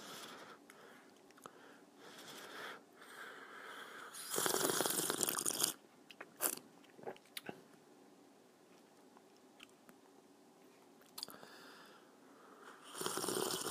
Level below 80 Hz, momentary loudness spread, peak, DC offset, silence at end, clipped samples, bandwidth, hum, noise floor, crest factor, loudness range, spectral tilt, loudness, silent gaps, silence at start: -88 dBFS; 26 LU; -12 dBFS; under 0.1%; 0 s; under 0.1%; 15.5 kHz; none; -65 dBFS; 34 dB; 19 LU; -1.5 dB/octave; -40 LUFS; none; 0 s